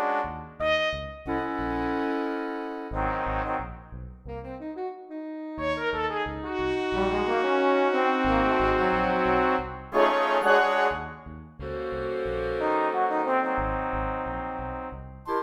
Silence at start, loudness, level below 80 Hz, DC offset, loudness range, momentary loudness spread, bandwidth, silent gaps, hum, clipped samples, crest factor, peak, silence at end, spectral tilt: 0 s; -26 LUFS; -42 dBFS; under 0.1%; 9 LU; 14 LU; 11.5 kHz; none; none; under 0.1%; 20 dB; -8 dBFS; 0 s; -6.5 dB/octave